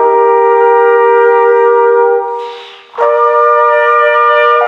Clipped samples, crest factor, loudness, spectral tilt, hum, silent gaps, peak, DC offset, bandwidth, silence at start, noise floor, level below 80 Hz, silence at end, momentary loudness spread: under 0.1%; 8 dB; -8 LUFS; -2.5 dB/octave; none; none; 0 dBFS; under 0.1%; 5.2 kHz; 0 s; -28 dBFS; -74 dBFS; 0 s; 11 LU